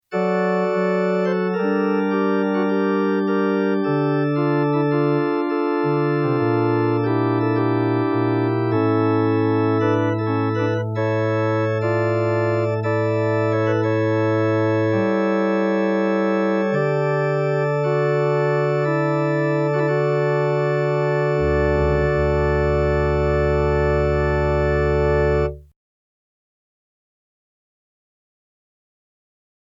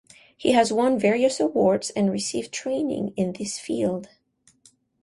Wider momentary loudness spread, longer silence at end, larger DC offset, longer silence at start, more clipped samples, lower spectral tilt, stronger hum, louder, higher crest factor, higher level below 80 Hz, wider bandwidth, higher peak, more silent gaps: second, 2 LU vs 8 LU; first, 4.1 s vs 0.95 s; neither; second, 0.1 s vs 0.4 s; neither; first, -9 dB/octave vs -4.5 dB/octave; neither; first, -20 LUFS vs -23 LUFS; second, 12 dB vs 18 dB; first, -34 dBFS vs -62 dBFS; second, 7.4 kHz vs 11.5 kHz; about the same, -8 dBFS vs -6 dBFS; neither